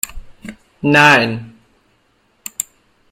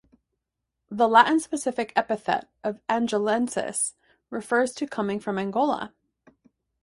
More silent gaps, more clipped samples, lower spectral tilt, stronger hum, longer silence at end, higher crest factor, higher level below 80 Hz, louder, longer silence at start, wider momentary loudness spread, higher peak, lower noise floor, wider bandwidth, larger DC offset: neither; neither; about the same, -3.5 dB/octave vs -3.5 dB/octave; neither; second, 0.5 s vs 0.95 s; second, 18 dB vs 24 dB; first, -42 dBFS vs -68 dBFS; first, -13 LUFS vs -25 LUFS; second, 0.05 s vs 0.9 s; first, 27 LU vs 13 LU; about the same, 0 dBFS vs -2 dBFS; second, -59 dBFS vs -83 dBFS; first, 16.5 kHz vs 11.5 kHz; neither